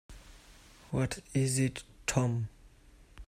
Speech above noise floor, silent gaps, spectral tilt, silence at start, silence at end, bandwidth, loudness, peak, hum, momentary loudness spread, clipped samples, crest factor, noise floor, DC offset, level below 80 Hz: 27 dB; none; -5 dB/octave; 0.1 s; 0.05 s; 15.5 kHz; -33 LUFS; -12 dBFS; none; 13 LU; under 0.1%; 22 dB; -58 dBFS; under 0.1%; -54 dBFS